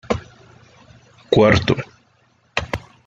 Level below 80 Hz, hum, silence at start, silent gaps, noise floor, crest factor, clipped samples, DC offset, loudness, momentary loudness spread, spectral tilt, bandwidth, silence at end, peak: -42 dBFS; none; 0.1 s; none; -59 dBFS; 20 dB; under 0.1%; under 0.1%; -19 LUFS; 14 LU; -6 dB/octave; 8.2 kHz; 0.3 s; 0 dBFS